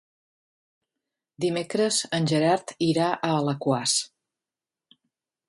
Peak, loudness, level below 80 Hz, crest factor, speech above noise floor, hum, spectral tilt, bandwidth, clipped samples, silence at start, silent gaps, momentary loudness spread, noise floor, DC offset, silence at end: -8 dBFS; -24 LUFS; -70 dBFS; 18 dB; over 66 dB; none; -4 dB/octave; 11.5 kHz; under 0.1%; 1.4 s; none; 5 LU; under -90 dBFS; under 0.1%; 1.45 s